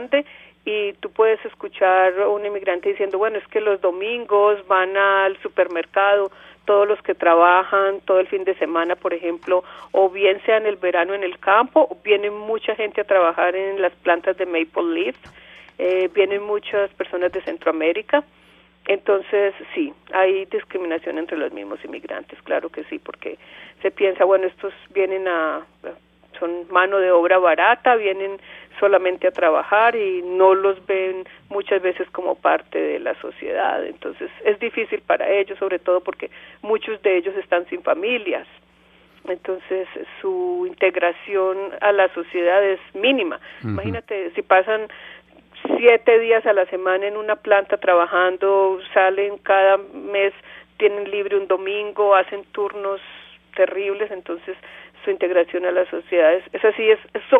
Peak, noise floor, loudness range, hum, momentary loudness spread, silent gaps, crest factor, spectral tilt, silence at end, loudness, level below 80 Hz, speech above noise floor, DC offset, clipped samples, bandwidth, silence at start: 0 dBFS; -54 dBFS; 6 LU; none; 13 LU; none; 20 dB; -7 dB/octave; 0 s; -20 LUFS; -62 dBFS; 34 dB; under 0.1%; under 0.1%; 3.8 kHz; 0 s